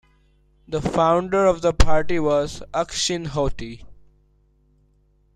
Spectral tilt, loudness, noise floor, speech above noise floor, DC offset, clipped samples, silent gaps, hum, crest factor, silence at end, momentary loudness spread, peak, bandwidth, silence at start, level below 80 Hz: -4.5 dB/octave; -21 LUFS; -60 dBFS; 41 dB; under 0.1%; under 0.1%; none; none; 20 dB; 1.4 s; 11 LU; -2 dBFS; 11 kHz; 0.7 s; -32 dBFS